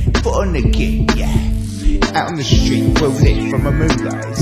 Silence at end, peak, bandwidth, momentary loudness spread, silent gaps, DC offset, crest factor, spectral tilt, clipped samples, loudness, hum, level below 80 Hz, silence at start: 0 s; 0 dBFS; 15 kHz; 5 LU; none; under 0.1%; 14 dB; -6 dB/octave; under 0.1%; -16 LUFS; none; -18 dBFS; 0 s